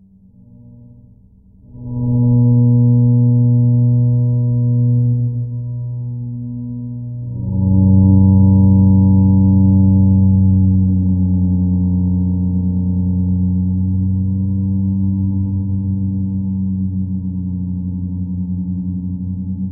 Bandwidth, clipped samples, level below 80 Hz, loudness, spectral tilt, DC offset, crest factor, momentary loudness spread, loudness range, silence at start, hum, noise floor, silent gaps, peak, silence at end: 1 kHz; under 0.1%; -36 dBFS; -15 LUFS; -19 dB/octave; under 0.1%; 14 dB; 13 LU; 8 LU; 0.7 s; none; -46 dBFS; none; -2 dBFS; 0 s